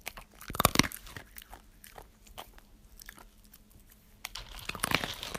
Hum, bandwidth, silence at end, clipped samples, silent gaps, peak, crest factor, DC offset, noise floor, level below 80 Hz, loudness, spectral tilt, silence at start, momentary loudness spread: none; 15.5 kHz; 0 s; under 0.1%; none; -2 dBFS; 34 dB; under 0.1%; -58 dBFS; -52 dBFS; -31 LUFS; -2.5 dB/octave; 0.05 s; 26 LU